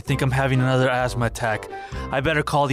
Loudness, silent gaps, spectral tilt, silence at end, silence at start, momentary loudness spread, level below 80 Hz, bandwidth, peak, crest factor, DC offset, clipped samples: -22 LUFS; none; -6 dB/octave; 0 s; 0.05 s; 9 LU; -38 dBFS; 14 kHz; -10 dBFS; 12 dB; under 0.1%; under 0.1%